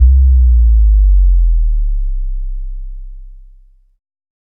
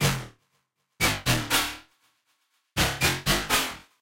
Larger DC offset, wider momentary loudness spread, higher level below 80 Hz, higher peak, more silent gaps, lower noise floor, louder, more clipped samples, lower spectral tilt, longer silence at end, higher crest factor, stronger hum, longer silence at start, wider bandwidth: neither; first, 20 LU vs 11 LU; first, -12 dBFS vs -42 dBFS; first, 0 dBFS vs -12 dBFS; neither; second, -43 dBFS vs -74 dBFS; first, -13 LUFS vs -25 LUFS; neither; first, -13.5 dB/octave vs -2.5 dB/octave; first, 1.25 s vs 0.2 s; about the same, 12 dB vs 16 dB; neither; about the same, 0 s vs 0 s; second, 0.2 kHz vs 16.5 kHz